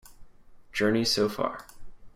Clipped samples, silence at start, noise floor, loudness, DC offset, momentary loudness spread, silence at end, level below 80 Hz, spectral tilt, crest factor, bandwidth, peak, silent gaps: under 0.1%; 0.05 s; -50 dBFS; -27 LUFS; under 0.1%; 11 LU; 0.05 s; -54 dBFS; -4 dB/octave; 18 dB; 16 kHz; -12 dBFS; none